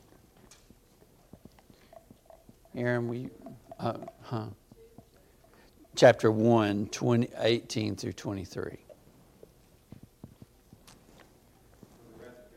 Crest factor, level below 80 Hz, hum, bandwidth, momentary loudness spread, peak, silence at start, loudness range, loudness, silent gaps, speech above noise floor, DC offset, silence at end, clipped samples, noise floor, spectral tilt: 26 dB; -64 dBFS; none; 15 kHz; 27 LU; -6 dBFS; 2.75 s; 13 LU; -29 LUFS; none; 33 dB; under 0.1%; 0.25 s; under 0.1%; -61 dBFS; -6 dB/octave